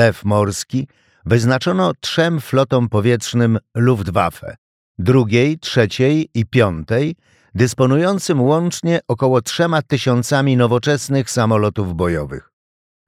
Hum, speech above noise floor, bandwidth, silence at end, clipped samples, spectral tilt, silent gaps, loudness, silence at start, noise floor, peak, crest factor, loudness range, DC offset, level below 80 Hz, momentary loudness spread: none; over 74 dB; 15 kHz; 0.7 s; under 0.1%; -6 dB/octave; 4.58-4.95 s; -17 LUFS; 0 s; under -90 dBFS; -2 dBFS; 16 dB; 1 LU; under 0.1%; -46 dBFS; 7 LU